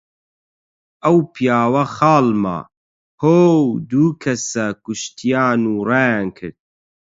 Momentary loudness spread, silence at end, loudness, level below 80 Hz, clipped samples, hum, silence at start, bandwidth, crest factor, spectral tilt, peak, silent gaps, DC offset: 12 LU; 0.55 s; -17 LUFS; -56 dBFS; under 0.1%; none; 1.05 s; 7.8 kHz; 16 dB; -6 dB/octave; 0 dBFS; 2.77-3.18 s; under 0.1%